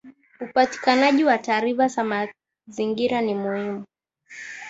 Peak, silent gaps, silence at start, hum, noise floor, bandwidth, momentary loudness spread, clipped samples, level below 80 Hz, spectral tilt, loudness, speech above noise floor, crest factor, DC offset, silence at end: -4 dBFS; none; 0.05 s; none; -46 dBFS; 8 kHz; 19 LU; under 0.1%; -68 dBFS; -4.5 dB/octave; -22 LUFS; 24 dB; 18 dB; under 0.1%; 0 s